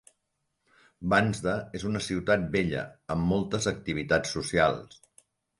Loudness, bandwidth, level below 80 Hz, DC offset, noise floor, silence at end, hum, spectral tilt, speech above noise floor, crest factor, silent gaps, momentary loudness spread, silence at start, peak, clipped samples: -28 LUFS; 11.5 kHz; -50 dBFS; under 0.1%; -79 dBFS; 0.75 s; none; -5 dB/octave; 51 dB; 20 dB; none; 8 LU; 1 s; -10 dBFS; under 0.1%